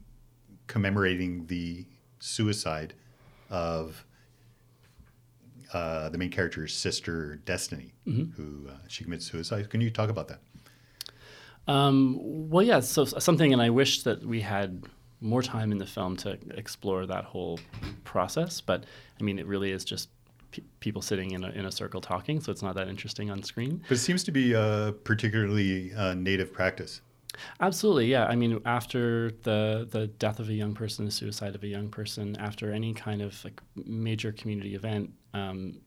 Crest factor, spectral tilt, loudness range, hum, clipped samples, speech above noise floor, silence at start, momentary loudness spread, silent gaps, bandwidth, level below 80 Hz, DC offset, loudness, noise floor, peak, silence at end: 22 dB; -5 dB/octave; 9 LU; none; under 0.1%; 31 dB; 0 s; 16 LU; none; 16 kHz; -58 dBFS; under 0.1%; -30 LUFS; -60 dBFS; -8 dBFS; 0.1 s